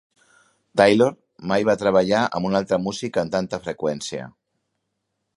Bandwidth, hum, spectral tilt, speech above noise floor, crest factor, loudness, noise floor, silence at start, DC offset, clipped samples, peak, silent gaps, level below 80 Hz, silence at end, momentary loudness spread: 11.5 kHz; none; -5.5 dB/octave; 56 dB; 22 dB; -21 LUFS; -77 dBFS; 0.75 s; under 0.1%; under 0.1%; -2 dBFS; none; -56 dBFS; 1.05 s; 13 LU